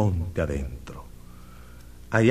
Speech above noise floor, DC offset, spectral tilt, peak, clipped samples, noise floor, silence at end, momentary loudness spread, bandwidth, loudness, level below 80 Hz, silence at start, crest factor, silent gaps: 19 dB; 0.3%; -7.5 dB/octave; -6 dBFS; under 0.1%; -46 dBFS; 0 s; 22 LU; 15 kHz; -28 LUFS; -40 dBFS; 0 s; 22 dB; none